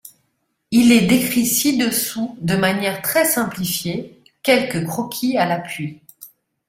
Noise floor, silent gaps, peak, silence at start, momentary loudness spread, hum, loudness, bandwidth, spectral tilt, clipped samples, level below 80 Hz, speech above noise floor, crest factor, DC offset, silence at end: -70 dBFS; none; -2 dBFS; 0.05 s; 11 LU; none; -18 LUFS; 16.5 kHz; -4 dB/octave; under 0.1%; -54 dBFS; 52 dB; 18 dB; under 0.1%; 0.4 s